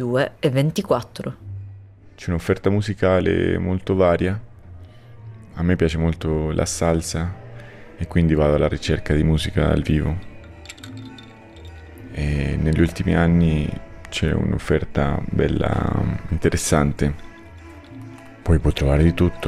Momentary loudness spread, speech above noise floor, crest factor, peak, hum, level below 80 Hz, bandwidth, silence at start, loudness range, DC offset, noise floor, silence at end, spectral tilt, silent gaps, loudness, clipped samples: 22 LU; 23 dB; 16 dB; -6 dBFS; none; -34 dBFS; 14 kHz; 0 s; 3 LU; under 0.1%; -42 dBFS; 0 s; -6.5 dB/octave; none; -21 LUFS; under 0.1%